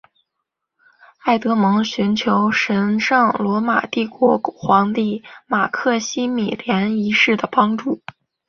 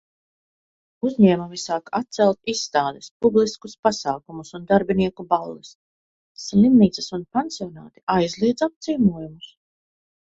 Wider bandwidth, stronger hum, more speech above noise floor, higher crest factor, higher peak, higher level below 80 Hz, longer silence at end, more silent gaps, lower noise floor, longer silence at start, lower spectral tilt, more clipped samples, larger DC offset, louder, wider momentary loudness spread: second, 7 kHz vs 7.8 kHz; neither; second, 61 dB vs over 69 dB; about the same, 18 dB vs 20 dB; about the same, 0 dBFS vs -2 dBFS; about the same, -60 dBFS vs -56 dBFS; second, 0.5 s vs 0.9 s; second, none vs 3.11-3.20 s, 3.79-3.83 s, 5.75-6.35 s, 8.03-8.07 s, 8.76-8.81 s; second, -78 dBFS vs under -90 dBFS; first, 1.25 s vs 1.05 s; about the same, -5 dB/octave vs -6 dB/octave; neither; neither; first, -18 LUFS vs -21 LUFS; second, 7 LU vs 16 LU